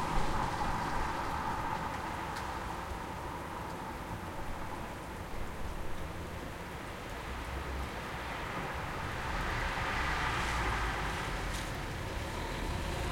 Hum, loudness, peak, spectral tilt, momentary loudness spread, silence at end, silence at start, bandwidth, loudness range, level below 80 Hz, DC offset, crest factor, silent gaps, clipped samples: none; -37 LUFS; -18 dBFS; -4.5 dB/octave; 9 LU; 0 s; 0 s; 16.5 kHz; 7 LU; -42 dBFS; under 0.1%; 18 dB; none; under 0.1%